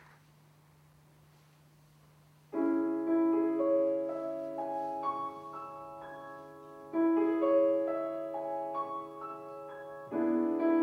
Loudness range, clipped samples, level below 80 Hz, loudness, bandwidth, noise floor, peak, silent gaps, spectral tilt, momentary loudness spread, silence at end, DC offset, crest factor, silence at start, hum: 4 LU; under 0.1%; -78 dBFS; -32 LUFS; 4.8 kHz; -62 dBFS; -18 dBFS; none; -8 dB/octave; 17 LU; 0 s; under 0.1%; 16 dB; 2.5 s; none